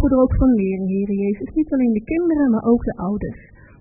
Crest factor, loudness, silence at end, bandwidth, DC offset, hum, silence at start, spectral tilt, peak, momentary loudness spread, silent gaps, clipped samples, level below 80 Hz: 14 dB; -19 LUFS; 0.45 s; 2.8 kHz; under 0.1%; none; 0 s; -16.5 dB/octave; -4 dBFS; 8 LU; none; under 0.1%; -32 dBFS